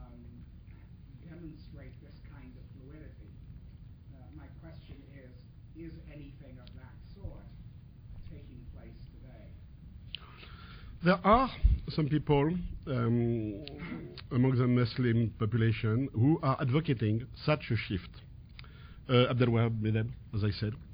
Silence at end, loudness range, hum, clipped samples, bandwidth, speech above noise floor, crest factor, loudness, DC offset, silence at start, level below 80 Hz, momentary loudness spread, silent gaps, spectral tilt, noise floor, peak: 0 s; 21 LU; none; under 0.1%; 5.2 kHz; 22 dB; 22 dB; -30 LUFS; under 0.1%; 0 s; -44 dBFS; 24 LU; none; -11 dB/octave; -51 dBFS; -10 dBFS